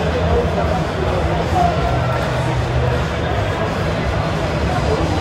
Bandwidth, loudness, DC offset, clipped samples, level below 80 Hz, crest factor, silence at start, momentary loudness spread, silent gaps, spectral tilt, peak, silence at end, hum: 13.5 kHz; -18 LUFS; under 0.1%; under 0.1%; -26 dBFS; 14 dB; 0 s; 3 LU; none; -6.5 dB/octave; -4 dBFS; 0 s; none